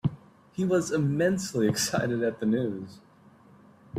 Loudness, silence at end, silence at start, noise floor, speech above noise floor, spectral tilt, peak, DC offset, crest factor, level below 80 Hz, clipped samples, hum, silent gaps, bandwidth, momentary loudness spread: -27 LUFS; 0 s; 0.05 s; -56 dBFS; 29 dB; -5.5 dB/octave; -12 dBFS; under 0.1%; 16 dB; -62 dBFS; under 0.1%; none; none; 15.5 kHz; 10 LU